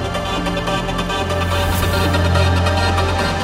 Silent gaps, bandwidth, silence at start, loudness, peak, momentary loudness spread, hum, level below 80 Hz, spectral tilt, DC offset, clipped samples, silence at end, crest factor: none; 16.5 kHz; 0 s; -18 LUFS; -4 dBFS; 5 LU; none; -28 dBFS; -5 dB/octave; under 0.1%; under 0.1%; 0 s; 14 dB